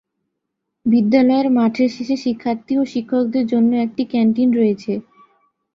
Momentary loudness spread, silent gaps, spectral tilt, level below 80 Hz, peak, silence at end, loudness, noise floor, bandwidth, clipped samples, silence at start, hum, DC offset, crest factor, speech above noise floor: 8 LU; none; -7.5 dB/octave; -62 dBFS; -2 dBFS; 0.75 s; -18 LUFS; -77 dBFS; 7 kHz; under 0.1%; 0.85 s; none; under 0.1%; 16 dB; 61 dB